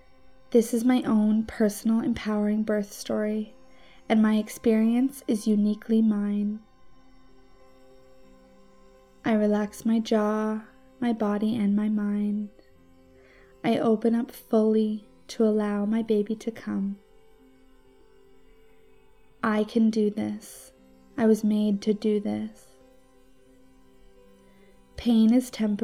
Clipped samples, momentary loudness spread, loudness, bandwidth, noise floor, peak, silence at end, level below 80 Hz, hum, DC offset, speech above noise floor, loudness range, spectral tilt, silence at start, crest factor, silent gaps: under 0.1%; 11 LU; -25 LUFS; 15 kHz; -59 dBFS; -10 dBFS; 0 s; -58 dBFS; none; 0.1%; 34 dB; 7 LU; -6.5 dB/octave; 0.5 s; 18 dB; none